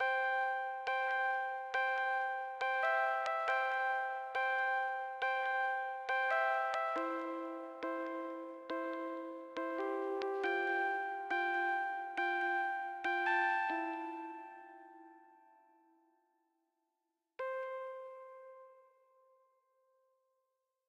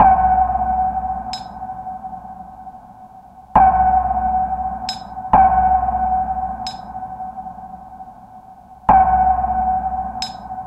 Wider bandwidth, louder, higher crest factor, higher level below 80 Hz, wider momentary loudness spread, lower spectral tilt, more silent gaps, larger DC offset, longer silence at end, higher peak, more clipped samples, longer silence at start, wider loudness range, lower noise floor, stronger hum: first, 11 kHz vs 8.4 kHz; second, -36 LUFS vs -17 LUFS; about the same, 16 dB vs 18 dB; second, under -90 dBFS vs -34 dBFS; second, 12 LU vs 22 LU; second, -2 dB/octave vs -5.5 dB/octave; neither; neither; first, 2.1 s vs 0 s; second, -22 dBFS vs -2 dBFS; neither; about the same, 0 s vs 0 s; first, 14 LU vs 6 LU; first, -87 dBFS vs -41 dBFS; neither